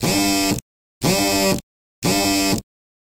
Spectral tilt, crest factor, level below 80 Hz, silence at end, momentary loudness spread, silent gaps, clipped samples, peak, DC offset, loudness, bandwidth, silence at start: -3.5 dB/octave; 16 dB; -42 dBFS; 0.4 s; 8 LU; 0.62-1.01 s, 1.63-2.02 s; under 0.1%; -6 dBFS; under 0.1%; -19 LUFS; 18.5 kHz; 0 s